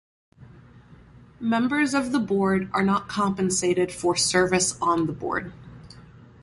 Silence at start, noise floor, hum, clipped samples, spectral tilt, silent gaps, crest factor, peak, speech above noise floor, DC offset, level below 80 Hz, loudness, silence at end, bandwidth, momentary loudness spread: 0.4 s; -50 dBFS; none; under 0.1%; -4 dB/octave; none; 18 dB; -8 dBFS; 26 dB; under 0.1%; -54 dBFS; -23 LUFS; 0.4 s; 11.5 kHz; 9 LU